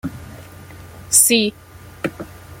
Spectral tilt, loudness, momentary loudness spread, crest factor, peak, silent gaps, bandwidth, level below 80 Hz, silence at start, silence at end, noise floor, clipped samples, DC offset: -2 dB/octave; -15 LUFS; 25 LU; 22 dB; 0 dBFS; none; 17 kHz; -50 dBFS; 0.05 s; 0.05 s; -38 dBFS; under 0.1%; under 0.1%